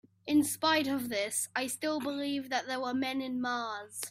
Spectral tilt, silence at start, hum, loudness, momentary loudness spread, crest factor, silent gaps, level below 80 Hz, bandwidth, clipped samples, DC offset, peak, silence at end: -2.5 dB/octave; 0.25 s; none; -32 LUFS; 6 LU; 18 dB; none; -74 dBFS; 16 kHz; under 0.1%; under 0.1%; -14 dBFS; 0 s